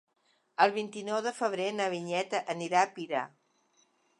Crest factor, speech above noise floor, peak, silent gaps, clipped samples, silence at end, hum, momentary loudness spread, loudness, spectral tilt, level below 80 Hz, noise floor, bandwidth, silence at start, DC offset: 24 dB; 39 dB; -8 dBFS; none; under 0.1%; 0.95 s; none; 8 LU; -31 LUFS; -4 dB/octave; -86 dBFS; -70 dBFS; 11.5 kHz; 0.6 s; under 0.1%